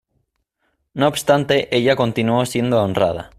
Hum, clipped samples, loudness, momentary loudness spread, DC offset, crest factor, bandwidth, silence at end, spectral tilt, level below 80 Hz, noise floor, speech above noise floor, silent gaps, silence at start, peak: none; under 0.1%; -18 LUFS; 4 LU; under 0.1%; 16 dB; 15.5 kHz; 0.1 s; -5.5 dB/octave; -52 dBFS; -70 dBFS; 52 dB; none; 0.95 s; -2 dBFS